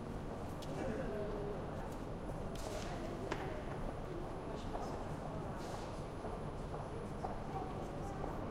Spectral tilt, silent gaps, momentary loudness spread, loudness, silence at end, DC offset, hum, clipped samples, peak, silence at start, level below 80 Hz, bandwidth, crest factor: -6.5 dB/octave; none; 3 LU; -44 LUFS; 0 s; under 0.1%; none; under 0.1%; -24 dBFS; 0 s; -50 dBFS; 15.5 kHz; 20 dB